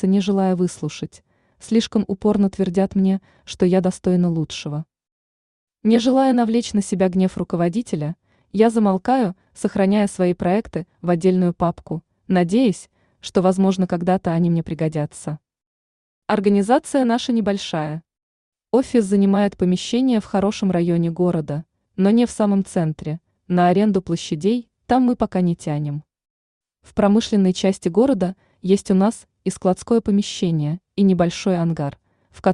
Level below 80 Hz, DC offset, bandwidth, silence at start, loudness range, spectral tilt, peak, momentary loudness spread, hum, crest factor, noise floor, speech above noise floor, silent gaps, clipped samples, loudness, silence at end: -52 dBFS; under 0.1%; 11 kHz; 0 s; 2 LU; -7 dB/octave; -4 dBFS; 12 LU; none; 16 dB; under -90 dBFS; over 71 dB; 5.12-5.67 s, 15.66-16.22 s, 18.22-18.52 s, 26.30-26.61 s; under 0.1%; -20 LUFS; 0 s